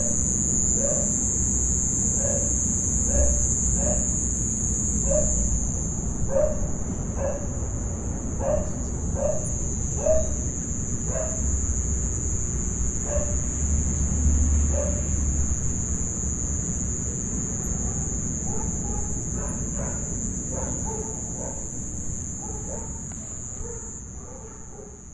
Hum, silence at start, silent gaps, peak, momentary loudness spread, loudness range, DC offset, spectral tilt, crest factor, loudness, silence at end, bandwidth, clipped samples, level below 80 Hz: none; 0 s; none; -10 dBFS; 10 LU; 8 LU; under 0.1%; -5.5 dB/octave; 16 dB; -25 LUFS; 0 s; 11.5 kHz; under 0.1%; -30 dBFS